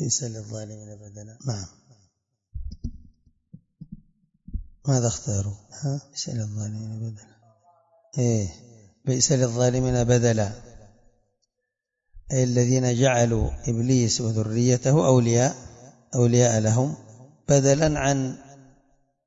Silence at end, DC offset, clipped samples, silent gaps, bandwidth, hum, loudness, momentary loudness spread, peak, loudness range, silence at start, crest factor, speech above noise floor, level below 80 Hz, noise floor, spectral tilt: 0.7 s; under 0.1%; under 0.1%; none; 8 kHz; none; -23 LUFS; 20 LU; -4 dBFS; 16 LU; 0 s; 20 dB; 60 dB; -44 dBFS; -82 dBFS; -5.5 dB/octave